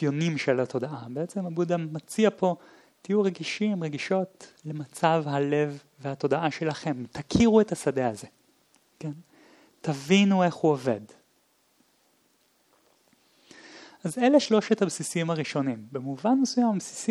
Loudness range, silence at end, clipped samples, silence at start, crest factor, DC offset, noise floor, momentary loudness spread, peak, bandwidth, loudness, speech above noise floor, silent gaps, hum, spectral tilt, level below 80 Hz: 3 LU; 0 s; under 0.1%; 0 s; 20 dB; under 0.1%; -67 dBFS; 16 LU; -8 dBFS; 13.5 kHz; -26 LUFS; 41 dB; none; none; -5.5 dB/octave; -60 dBFS